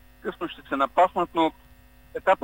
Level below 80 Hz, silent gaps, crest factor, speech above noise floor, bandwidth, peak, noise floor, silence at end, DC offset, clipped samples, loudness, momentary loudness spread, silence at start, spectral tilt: -54 dBFS; none; 18 dB; 28 dB; 16 kHz; -8 dBFS; -52 dBFS; 0.05 s; under 0.1%; under 0.1%; -25 LUFS; 14 LU; 0.25 s; -5.5 dB/octave